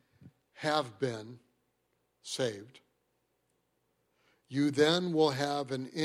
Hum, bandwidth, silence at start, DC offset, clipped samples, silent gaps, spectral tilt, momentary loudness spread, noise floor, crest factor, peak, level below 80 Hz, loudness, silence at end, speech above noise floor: none; 15 kHz; 0.25 s; under 0.1%; under 0.1%; none; -5 dB/octave; 17 LU; -78 dBFS; 20 dB; -14 dBFS; -76 dBFS; -32 LUFS; 0 s; 47 dB